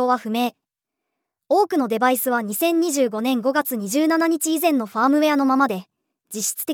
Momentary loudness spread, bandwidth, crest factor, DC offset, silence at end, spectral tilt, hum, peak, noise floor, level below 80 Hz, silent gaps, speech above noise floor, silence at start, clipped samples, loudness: 6 LU; over 20 kHz; 16 dB; under 0.1%; 0 s; -3.5 dB/octave; none; -6 dBFS; -83 dBFS; -84 dBFS; none; 63 dB; 0 s; under 0.1%; -20 LUFS